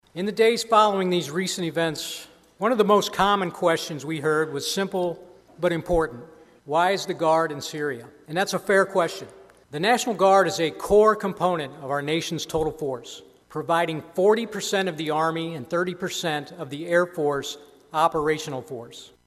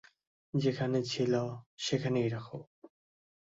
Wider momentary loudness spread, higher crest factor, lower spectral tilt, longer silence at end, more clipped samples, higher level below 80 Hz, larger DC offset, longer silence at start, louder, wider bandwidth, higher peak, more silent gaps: first, 15 LU vs 10 LU; about the same, 18 dB vs 18 dB; second, -4.5 dB/octave vs -6 dB/octave; second, 0.2 s vs 0.7 s; neither; first, -50 dBFS vs -70 dBFS; neither; second, 0.15 s vs 0.55 s; first, -24 LUFS vs -33 LUFS; first, 14.5 kHz vs 8 kHz; first, -6 dBFS vs -16 dBFS; second, none vs 1.66-1.77 s, 2.67-2.82 s